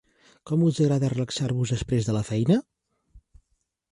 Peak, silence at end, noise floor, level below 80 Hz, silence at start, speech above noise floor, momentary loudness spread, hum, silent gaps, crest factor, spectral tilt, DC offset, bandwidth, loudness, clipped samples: -10 dBFS; 0.75 s; -74 dBFS; -50 dBFS; 0.45 s; 51 dB; 5 LU; none; none; 16 dB; -7 dB/octave; under 0.1%; 11.5 kHz; -25 LUFS; under 0.1%